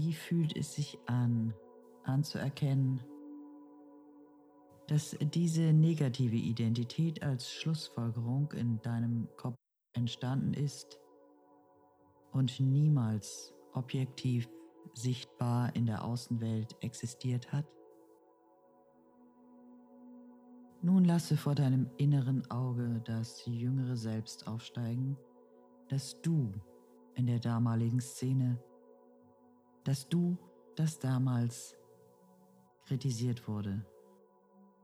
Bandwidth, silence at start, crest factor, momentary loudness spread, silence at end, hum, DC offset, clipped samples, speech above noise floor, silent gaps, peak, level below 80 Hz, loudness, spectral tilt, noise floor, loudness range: 14 kHz; 0 s; 16 dB; 14 LU; 1 s; none; under 0.1%; under 0.1%; 32 dB; none; -20 dBFS; -76 dBFS; -34 LUFS; -7 dB/octave; -65 dBFS; 7 LU